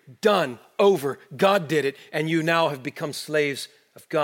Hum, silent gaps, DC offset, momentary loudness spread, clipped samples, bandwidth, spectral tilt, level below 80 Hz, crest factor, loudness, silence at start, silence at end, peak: none; none; under 0.1%; 11 LU; under 0.1%; 17 kHz; -5 dB/octave; -76 dBFS; 18 dB; -23 LUFS; 0.1 s; 0 s; -6 dBFS